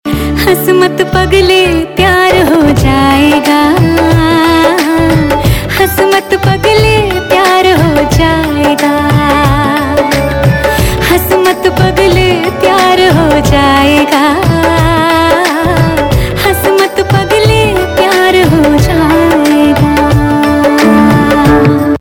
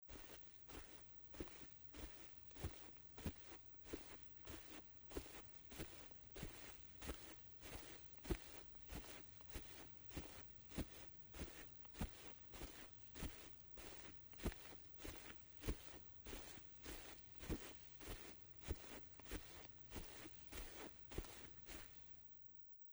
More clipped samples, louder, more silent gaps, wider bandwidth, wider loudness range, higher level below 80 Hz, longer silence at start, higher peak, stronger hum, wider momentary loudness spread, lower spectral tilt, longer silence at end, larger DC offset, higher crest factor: first, 1% vs under 0.1%; first, -7 LUFS vs -54 LUFS; neither; about the same, 19.5 kHz vs over 20 kHz; about the same, 2 LU vs 1 LU; first, -22 dBFS vs -60 dBFS; about the same, 0.05 s vs 0 s; first, 0 dBFS vs -30 dBFS; neither; about the same, 4 LU vs 5 LU; first, -5.5 dB/octave vs -4 dB/octave; about the same, 0 s vs 0 s; neither; second, 8 dB vs 26 dB